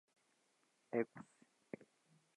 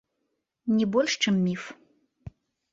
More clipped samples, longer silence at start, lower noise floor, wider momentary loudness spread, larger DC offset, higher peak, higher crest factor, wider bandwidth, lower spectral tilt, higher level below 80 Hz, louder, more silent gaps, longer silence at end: neither; first, 0.9 s vs 0.65 s; about the same, -80 dBFS vs -79 dBFS; first, 18 LU vs 13 LU; neither; second, -24 dBFS vs -10 dBFS; first, 24 dB vs 18 dB; first, 11 kHz vs 7.6 kHz; first, -7.5 dB/octave vs -5 dB/octave; second, under -90 dBFS vs -62 dBFS; second, -46 LUFS vs -26 LUFS; neither; first, 1.15 s vs 0.45 s